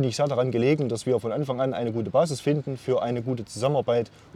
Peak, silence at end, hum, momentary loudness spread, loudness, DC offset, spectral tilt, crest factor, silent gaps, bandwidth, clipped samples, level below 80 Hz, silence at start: -10 dBFS; 0.3 s; none; 5 LU; -25 LUFS; under 0.1%; -6.5 dB/octave; 14 dB; none; 14 kHz; under 0.1%; -64 dBFS; 0 s